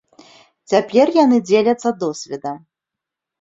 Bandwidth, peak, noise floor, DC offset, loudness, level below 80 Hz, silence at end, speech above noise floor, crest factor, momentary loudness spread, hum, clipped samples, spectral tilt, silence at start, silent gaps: 7.8 kHz; -2 dBFS; -84 dBFS; under 0.1%; -17 LUFS; -64 dBFS; 0.85 s; 69 dB; 16 dB; 15 LU; none; under 0.1%; -5 dB/octave; 0.7 s; none